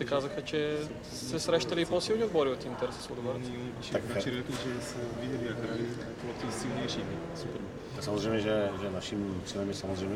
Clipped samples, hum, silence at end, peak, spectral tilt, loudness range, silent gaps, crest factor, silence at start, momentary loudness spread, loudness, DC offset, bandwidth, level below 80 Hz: under 0.1%; none; 0 s; -14 dBFS; -5 dB/octave; 4 LU; none; 20 dB; 0 s; 9 LU; -34 LUFS; under 0.1%; 16 kHz; -56 dBFS